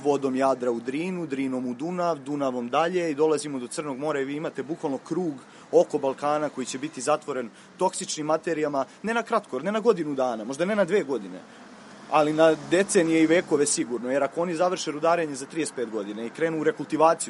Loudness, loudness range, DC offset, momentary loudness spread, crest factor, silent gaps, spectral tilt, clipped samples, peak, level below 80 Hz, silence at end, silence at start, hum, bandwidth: -26 LUFS; 5 LU; under 0.1%; 10 LU; 20 dB; none; -4.5 dB/octave; under 0.1%; -6 dBFS; -74 dBFS; 0 s; 0 s; none; 11.5 kHz